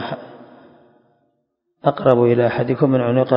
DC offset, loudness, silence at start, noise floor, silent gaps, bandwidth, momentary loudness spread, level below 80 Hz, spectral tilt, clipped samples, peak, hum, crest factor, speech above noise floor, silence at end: under 0.1%; -17 LUFS; 0 s; -71 dBFS; none; 5.4 kHz; 11 LU; -58 dBFS; -10.5 dB/octave; under 0.1%; 0 dBFS; none; 18 dB; 55 dB; 0 s